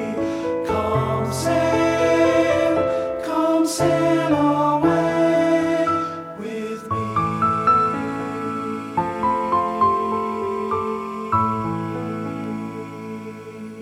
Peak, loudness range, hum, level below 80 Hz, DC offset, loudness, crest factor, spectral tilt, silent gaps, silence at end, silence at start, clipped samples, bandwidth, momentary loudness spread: -6 dBFS; 4 LU; none; -50 dBFS; under 0.1%; -21 LUFS; 14 dB; -6 dB/octave; none; 0 s; 0 s; under 0.1%; 15 kHz; 12 LU